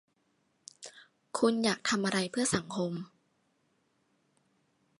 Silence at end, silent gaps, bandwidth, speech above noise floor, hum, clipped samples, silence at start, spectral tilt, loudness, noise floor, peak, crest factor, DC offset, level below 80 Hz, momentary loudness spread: 1.95 s; none; 11.5 kHz; 44 dB; none; under 0.1%; 0.8 s; -4 dB/octave; -31 LUFS; -75 dBFS; -12 dBFS; 22 dB; under 0.1%; -70 dBFS; 21 LU